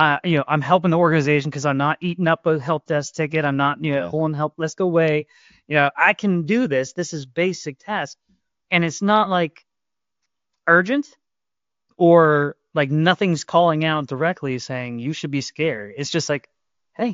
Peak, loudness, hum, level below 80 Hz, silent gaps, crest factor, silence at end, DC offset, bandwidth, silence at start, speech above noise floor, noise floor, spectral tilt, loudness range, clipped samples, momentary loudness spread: -2 dBFS; -20 LUFS; none; -64 dBFS; none; 20 dB; 0 s; under 0.1%; 7.6 kHz; 0 s; 69 dB; -89 dBFS; -5.5 dB/octave; 4 LU; under 0.1%; 10 LU